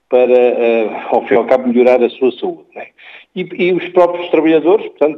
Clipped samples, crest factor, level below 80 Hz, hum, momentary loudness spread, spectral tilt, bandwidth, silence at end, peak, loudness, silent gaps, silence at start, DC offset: under 0.1%; 12 dB; -64 dBFS; none; 16 LU; -7.5 dB/octave; 5.8 kHz; 0 s; 0 dBFS; -13 LUFS; none; 0.1 s; under 0.1%